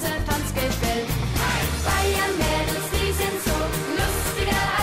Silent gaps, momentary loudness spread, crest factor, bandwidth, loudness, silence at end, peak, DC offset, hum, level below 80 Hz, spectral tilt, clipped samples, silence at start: none; 3 LU; 12 dB; 16.5 kHz; -23 LUFS; 0 s; -10 dBFS; under 0.1%; none; -30 dBFS; -4 dB/octave; under 0.1%; 0 s